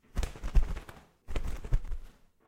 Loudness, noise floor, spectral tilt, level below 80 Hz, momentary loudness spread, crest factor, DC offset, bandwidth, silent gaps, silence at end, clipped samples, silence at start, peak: -38 LUFS; -51 dBFS; -6 dB/octave; -32 dBFS; 15 LU; 20 dB; under 0.1%; 11.5 kHz; none; 0.4 s; under 0.1%; 0.15 s; -12 dBFS